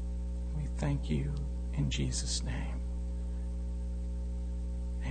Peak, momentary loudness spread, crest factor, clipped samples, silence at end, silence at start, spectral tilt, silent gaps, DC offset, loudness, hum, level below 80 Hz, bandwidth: -22 dBFS; 6 LU; 14 dB; under 0.1%; 0 s; 0 s; -5 dB/octave; none; under 0.1%; -36 LUFS; 60 Hz at -35 dBFS; -36 dBFS; 9.4 kHz